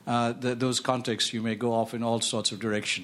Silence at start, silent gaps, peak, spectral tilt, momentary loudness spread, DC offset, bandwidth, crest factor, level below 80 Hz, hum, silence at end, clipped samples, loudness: 0.05 s; none; -10 dBFS; -3.5 dB/octave; 2 LU; under 0.1%; 13 kHz; 18 dB; -68 dBFS; none; 0 s; under 0.1%; -28 LUFS